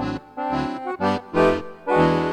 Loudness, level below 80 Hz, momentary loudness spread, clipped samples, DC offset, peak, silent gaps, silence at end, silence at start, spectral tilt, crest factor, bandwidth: -22 LUFS; -46 dBFS; 9 LU; under 0.1%; under 0.1%; -4 dBFS; none; 0 s; 0 s; -7 dB/octave; 18 dB; 10 kHz